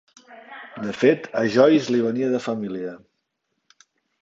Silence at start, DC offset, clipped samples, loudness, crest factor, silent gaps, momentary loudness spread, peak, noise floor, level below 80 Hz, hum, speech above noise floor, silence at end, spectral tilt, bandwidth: 0.3 s; under 0.1%; under 0.1%; -21 LUFS; 20 dB; none; 20 LU; -4 dBFS; -76 dBFS; -68 dBFS; none; 56 dB; 1.25 s; -6 dB/octave; 7.8 kHz